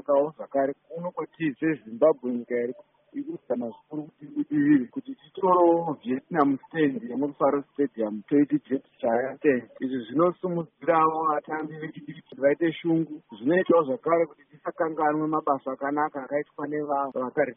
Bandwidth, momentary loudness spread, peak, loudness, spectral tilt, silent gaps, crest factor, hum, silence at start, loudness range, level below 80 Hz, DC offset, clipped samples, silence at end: 3.8 kHz; 14 LU; -6 dBFS; -26 LUFS; -3 dB/octave; none; 20 dB; none; 0.1 s; 4 LU; -74 dBFS; under 0.1%; under 0.1%; 0.05 s